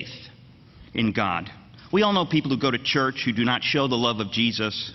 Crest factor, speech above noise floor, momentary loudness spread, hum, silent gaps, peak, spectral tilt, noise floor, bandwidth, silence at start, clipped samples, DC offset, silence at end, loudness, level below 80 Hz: 18 dB; 26 dB; 9 LU; none; none; -6 dBFS; -5.5 dB/octave; -49 dBFS; 6.4 kHz; 0 s; under 0.1%; under 0.1%; 0 s; -23 LUFS; -56 dBFS